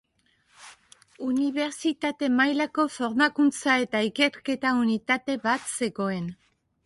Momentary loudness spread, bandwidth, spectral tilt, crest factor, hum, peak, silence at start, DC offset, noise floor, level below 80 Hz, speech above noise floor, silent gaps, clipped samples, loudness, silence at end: 7 LU; 11.5 kHz; -4 dB/octave; 18 dB; none; -8 dBFS; 0.6 s; under 0.1%; -68 dBFS; -68 dBFS; 42 dB; none; under 0.1%; -25 LUFS; 0.5 s